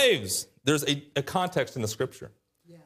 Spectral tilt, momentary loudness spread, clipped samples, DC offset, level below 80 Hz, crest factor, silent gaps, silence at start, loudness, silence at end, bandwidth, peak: -3.5 dB/octave; 9 LU; under 0.1%; under 0.1%; -66 dBFS; 20 dB; none; 0 s; -28 LUFS; 0.1 s; 15.5 kHz; -10 dBFS